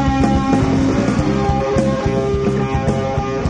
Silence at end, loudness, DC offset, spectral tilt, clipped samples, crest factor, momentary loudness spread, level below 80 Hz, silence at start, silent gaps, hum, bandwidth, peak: 0 s; -17 LUFS; under 0.1%; -7 dB/octave; under 0.1%; 14 dB; 3 LU; -28 dBFS; 0 s; none; none; 10 kHz; -2 dBFS